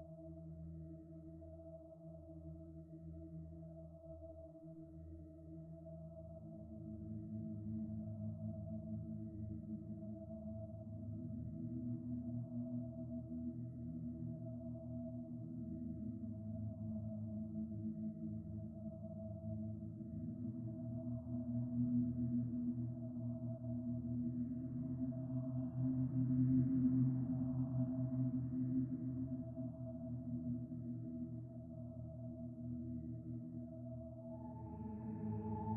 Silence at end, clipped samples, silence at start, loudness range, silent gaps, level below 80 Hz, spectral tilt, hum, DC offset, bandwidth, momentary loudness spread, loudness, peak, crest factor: 0 s; under 0.1%; 0 s; 16 LU; none; -64 dBFS; -13.5 dB/octave; none; under 0.1%; 1.9 kHz; 15 LU; -45 LUFS; -26 dBFS; 18 dB